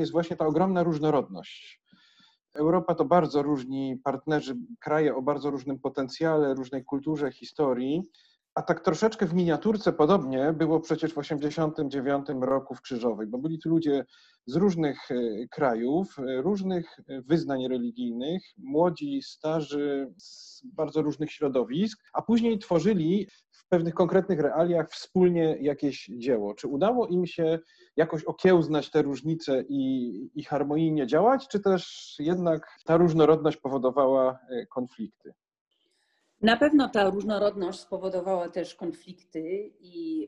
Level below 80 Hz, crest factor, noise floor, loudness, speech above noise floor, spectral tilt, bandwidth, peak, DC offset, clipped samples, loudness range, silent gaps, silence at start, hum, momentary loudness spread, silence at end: -64 dBFS; 20 dB; -72 dBFS; -27 LUFS; 46 dB; -7 dB/octave; 8.6 kHz; -6 dBFS; under 0.1%; under 0.1%; 4 LU; 8.52-8.56 s, 35.61-35.66 s; 0 s; none; 12 LU; 0 s